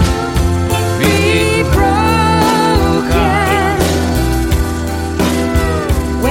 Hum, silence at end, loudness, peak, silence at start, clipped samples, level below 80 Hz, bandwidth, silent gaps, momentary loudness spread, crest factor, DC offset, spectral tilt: none; 0 s; -13 LUFS; 0 dBFS; 0 s; under 0.1%; -20 dBFS; 16.5 kHz; none; 5 LU; 12 dB; under 0.1%; -5.5 dB/octave